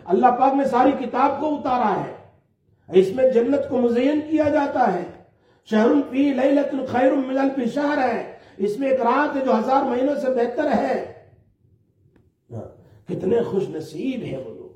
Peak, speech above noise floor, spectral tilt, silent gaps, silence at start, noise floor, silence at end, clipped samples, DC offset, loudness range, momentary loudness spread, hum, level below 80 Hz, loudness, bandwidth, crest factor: -4 dBFS; 42 dB; -7 dB/octave; none; 0.05 s; -61 dBFS; 0.1 s; under 0.1%; under 0.1%; 7 LU; 11 LU; none; -62 dBFS; -21 LUFS; 10 kHz; 18 dB